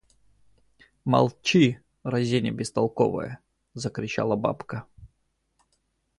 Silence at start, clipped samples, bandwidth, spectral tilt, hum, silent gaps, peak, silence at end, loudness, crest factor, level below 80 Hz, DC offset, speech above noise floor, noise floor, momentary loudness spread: 1.05 s; under 0.1%; 11.5 kHz; -6 dB/octave; none; none; -6 dBFS; 1.15 s; -25 LUFS; 20 dB; -58 dBFS; under 0.1%; 48 dB; -73 dBFS; 16 LU